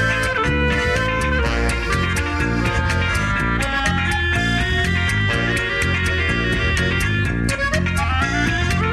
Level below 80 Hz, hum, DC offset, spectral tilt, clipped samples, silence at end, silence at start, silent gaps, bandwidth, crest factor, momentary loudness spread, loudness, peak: -26 dBFS; none; under 0.1%; -5 dB/octave; under 0.1%; 0 s; 0 s; none; 13.5 kHz; 12 dB; 2 LU; -19 LUFS; -6 dBFS